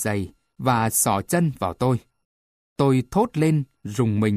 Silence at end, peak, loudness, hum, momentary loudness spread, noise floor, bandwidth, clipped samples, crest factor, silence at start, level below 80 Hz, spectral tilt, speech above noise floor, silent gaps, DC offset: 0 s; -6 dBFS; -22 LUFS; none; 9 LU; under -90 dBFS; 15.5 kHz; under 0.1%; 16 dB; 0 s; -52 dBFS; -5.5 dB/octave; over 69 dB; 2.25-2.76 s; under 0.1%